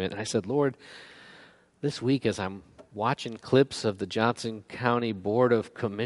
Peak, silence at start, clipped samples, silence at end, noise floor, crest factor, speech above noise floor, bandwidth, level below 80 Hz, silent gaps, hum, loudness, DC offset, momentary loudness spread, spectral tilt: -8 dBFS; 0 s; under 0.1%; 0 s; -55 dBFS; 22 dB; 27 dB; 11.5 kHz; -66 dBFS; none; none; -28 LUFS; under 0.1%; 19 LU; -5.5 dB/octave